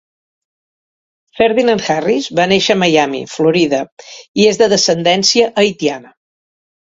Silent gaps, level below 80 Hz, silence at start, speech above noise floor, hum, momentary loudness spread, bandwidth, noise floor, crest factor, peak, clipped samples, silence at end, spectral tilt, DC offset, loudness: 3.92-3.97 s, 4.28-4.34 s; -54 dBFS; 1.35 s; over 77 dB; none; 9 LU; 8 kHz; under -90 dBFS; 14 dB; 0 dBFS; under 0.1%; 0.85 s; -3.5 dB/octave; under 0.1%; -13 LUFS